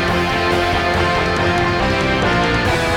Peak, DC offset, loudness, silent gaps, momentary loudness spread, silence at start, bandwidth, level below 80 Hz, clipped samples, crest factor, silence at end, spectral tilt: -4 dBFS; under 0.1%; -16 LUFS; none; 1 LU; 0 s; 17 kHz; -30 dBFS; under 0.1%; 12 dB; 0 s; -5 dB/octave